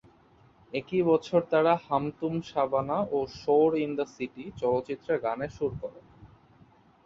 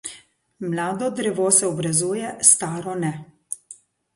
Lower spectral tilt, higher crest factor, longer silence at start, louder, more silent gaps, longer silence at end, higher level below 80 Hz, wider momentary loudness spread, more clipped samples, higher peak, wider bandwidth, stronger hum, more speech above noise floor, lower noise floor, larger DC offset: first, -7.5 dB/octave vs -3.5 dB/octave; second, 18 dB vs 24 dB; first, 0.75 s vs 0.05 s; second, -28 LUFS vs -20 LUFS; neither; first, 0.8 s vs 0.4 s; first, -60 dBFS vs -66 dBFS; second, 12 LU vs 19 LU; neither; second, -10 dBFS vs 0 dBFS; second, 7.4 kHz vs 12 kHz; neither; first, 32 dB vs 27 dB; first, -60 dBFS vs -49 dBFS; neither